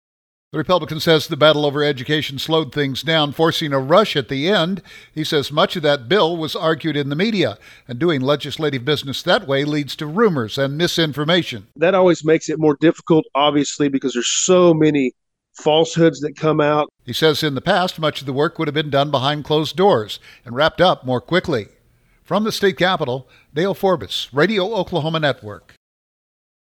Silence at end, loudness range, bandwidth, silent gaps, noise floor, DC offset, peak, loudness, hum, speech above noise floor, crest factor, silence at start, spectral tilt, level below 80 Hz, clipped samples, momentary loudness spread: 1.2 s; 3 LU; 18.5 kHz; none; -57 dBFS; under 0.1%; 0 dBFS; -18 LUFS; none; 39 dB; 18 dB; 0.55 s; -4.5 dB/octave; -54 dBFS; under 0.1%; 8 LU